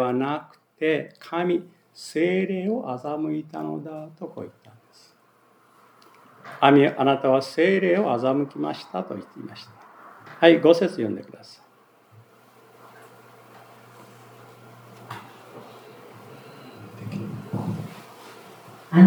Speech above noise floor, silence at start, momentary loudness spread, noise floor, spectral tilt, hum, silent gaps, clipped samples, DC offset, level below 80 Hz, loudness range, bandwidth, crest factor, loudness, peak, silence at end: 36 dB; 0 s; 27 LU; -59 dBFS; -7.5 dB/octave; none; none; under 0.1%; under 0.1%; -78 dBFS; 23 LU; over 20 kHz; 24 dB; -23 LUFS; 0 dBFS; 0 s